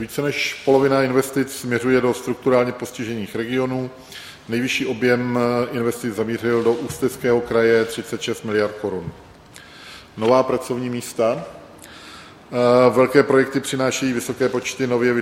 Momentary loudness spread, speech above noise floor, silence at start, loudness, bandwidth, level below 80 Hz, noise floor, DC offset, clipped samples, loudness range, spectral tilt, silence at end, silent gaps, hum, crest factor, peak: 20 LU; 24 dB; 0 s; -20 LUFS; 17 kHz; -56 dBFS; -43 dBFS; under 0.1%; under 0.1%; 4 LU; -5 dB/octave; 0 s; none; none; 20 dB; 0 dBFS